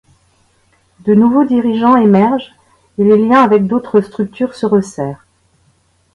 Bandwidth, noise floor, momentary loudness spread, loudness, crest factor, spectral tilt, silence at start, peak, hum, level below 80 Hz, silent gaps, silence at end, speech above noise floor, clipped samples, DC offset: 11 kHz; -56 dBFS; 13 LU; -12 LUFS; 12 dB; -8 dB/octave; 1.05 s; 0 dBFS; none; -52 dBFS; none; 1 s; 44 dB; under 0.1%; under 0.1%